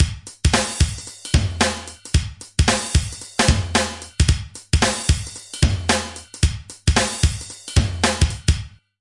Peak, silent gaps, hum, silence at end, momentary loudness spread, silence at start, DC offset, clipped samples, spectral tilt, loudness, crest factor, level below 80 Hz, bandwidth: -2 dBFS; none; none; 0.35 s; 8 LU; 0 s; under 0.1%; under 0.1%; -4 dB/octave; -21 LUFS; 18 dB; -26 dBFS; 11.5 kHz